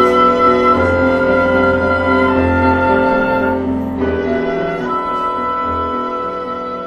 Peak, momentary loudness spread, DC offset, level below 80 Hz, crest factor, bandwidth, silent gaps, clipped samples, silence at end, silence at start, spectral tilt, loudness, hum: 0 dBFS; 8 LU; under 0.1%; -36 dBFS; 14 dB; 8.8 kHz; none; under 0.1%; 0 s; 0 s; -7.5 dB/octave; -14 LUFS; none